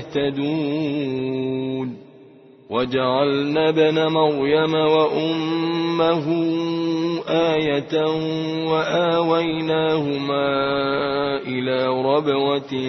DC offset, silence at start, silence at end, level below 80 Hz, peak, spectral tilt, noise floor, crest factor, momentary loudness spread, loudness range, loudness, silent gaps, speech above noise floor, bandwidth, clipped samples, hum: under 0.1%; 0 s; 0 s; -58 dBFS; -4 dBFS; -7 dB/octave; -47 dBFS; 16 dB; 6 LU; 3 LU; -20 LUFS; none; 27 dB; 6.2 kHz; under 0.1%; none